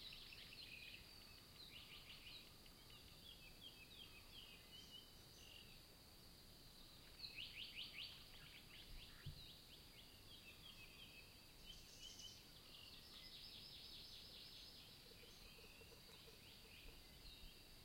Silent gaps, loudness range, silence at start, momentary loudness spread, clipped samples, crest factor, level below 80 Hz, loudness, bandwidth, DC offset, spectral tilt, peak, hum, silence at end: none; 5 LU; 0 s; 7 LU; under 0.1%; 20 dB; -70 dBFS; -59 LUFS; 16.5 kHz; under 0.1%; -2.5 dB/octave; -40 dBFS; none; 0 s